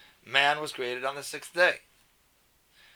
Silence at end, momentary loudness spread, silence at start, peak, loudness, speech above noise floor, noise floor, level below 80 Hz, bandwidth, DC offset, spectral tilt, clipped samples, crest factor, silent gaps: 1.15 s; 12 LU; 0.25 s; -6 dBFS; -27 LUFS; 38 dB; -66 dBFS; -74 dBFS; over 20 kHz; under 0.1%; -2 dB/octave; under 0.1%; 24 dB; none